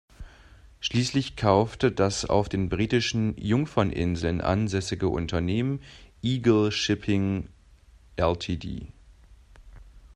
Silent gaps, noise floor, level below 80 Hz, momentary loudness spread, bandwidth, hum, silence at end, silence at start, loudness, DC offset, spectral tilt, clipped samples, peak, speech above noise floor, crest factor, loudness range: none; -54 dBFS; -46 dBFS; 10 LU; 10.5 kHz; none; 0.1 s; 0.2 s; -26 LUFS; under 0.1%; -6 dB/octave; under 0.1%; -4 dBFS; 29 dB; 22 dB; 3 LU